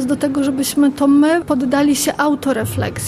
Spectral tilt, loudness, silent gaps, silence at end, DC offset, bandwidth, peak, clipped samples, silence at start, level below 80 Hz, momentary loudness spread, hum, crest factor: -4.5 dB/octave; -16 LUFS; none; 0 s; under 0.1%; 15 kHz; -4 dBFS; under 0.1%; 0 s; -46 dBFS; 6 LU; none; 12 dB